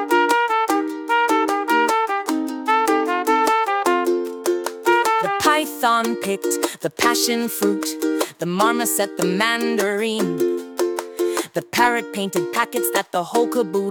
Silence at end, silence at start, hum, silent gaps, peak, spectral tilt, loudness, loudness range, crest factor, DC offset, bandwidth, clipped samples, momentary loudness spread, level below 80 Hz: 0 s; 0 s; none; none; -4 dBFS; -3 dB/octave; -20 LUFS; 2 LU; 16 dB; under 0.1%; 19.5 kHz; under 0.1%; 6 LU; -68 dBFS